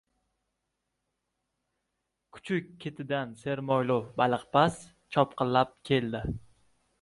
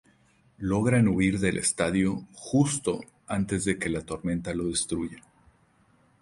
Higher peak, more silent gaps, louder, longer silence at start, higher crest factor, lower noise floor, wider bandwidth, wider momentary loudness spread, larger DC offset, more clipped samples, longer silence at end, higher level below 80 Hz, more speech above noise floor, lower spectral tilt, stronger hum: about the same, -8 dBFS vs -10 dBFS; neither; about the same, -29 LUFS vs -27 LUFS; first, 2.35 s vs 0.6 s; first, 24 dB vs 18 dB; first, -83 dBFS vs -63 dBFS; about the same, 11.5 kHz vs 11.5 kHz; first, 14 LU vs 10 LU; neither; neither; second, 0.65 s vs 1 s; second, -56 dBFS vs -50 dBFS; first, 54 dB vs 37 dB; first, -6.5 dB/octave vs -5 dB/octave; neither